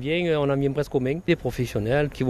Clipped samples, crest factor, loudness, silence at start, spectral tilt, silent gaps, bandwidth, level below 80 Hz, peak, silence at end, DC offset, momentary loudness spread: under 0.1%; 16 dB; -24 LUFS; 0 s; -7 dB/octave; none; 14 kHz; -44 dBFS; -8 dBFS; 0 s; under 0.1%; 3 LU